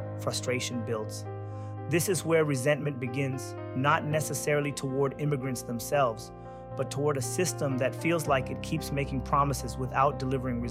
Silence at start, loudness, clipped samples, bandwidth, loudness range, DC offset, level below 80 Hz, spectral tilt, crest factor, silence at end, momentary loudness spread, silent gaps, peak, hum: 0 s; -30 LUFS; under 0.1%; 16 kHz; 2 LU; under 0.1%; -48 dBFS; -5 dB/octave; 18 dB; 0 s; 10 LU; none; -12 dBFS; none